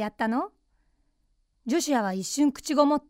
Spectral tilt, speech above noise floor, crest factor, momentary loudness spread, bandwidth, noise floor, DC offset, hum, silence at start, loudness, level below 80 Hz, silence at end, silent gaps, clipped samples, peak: -4 dB/octave; 45 dB; 18 dB; 9 LU; 16 kHz; -70 dBFS; under 0.1%; none; 0 s; -26 LUFS; -62 dBFS; 0.1 s; none; under 0.1%; -8 dBFS